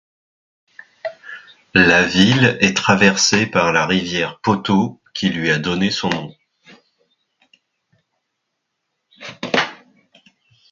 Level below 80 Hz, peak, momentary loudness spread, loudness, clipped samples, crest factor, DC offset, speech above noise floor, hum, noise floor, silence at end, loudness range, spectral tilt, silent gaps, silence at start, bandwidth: -50 dBFS; 0 dBFS; 19 LU; -16 LUFS; under 0.1%; 20 dB; under 0.1%; 60 dB; none; -75 dBFS; 0.95 s; 14 LU; -4 dB/octave; none; 1.05 s; 7.6 kHz